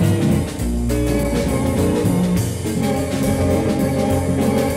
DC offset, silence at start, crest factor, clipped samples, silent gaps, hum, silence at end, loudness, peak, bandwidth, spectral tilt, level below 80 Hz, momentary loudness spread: under 0.1%; 0 s; 12 dB; under 0.1%; none; none; 0 s; -19 LUFS; -6 dBFS; 16.5 kHz; -6.5 dB/octave; -30 dBFS; 3 LU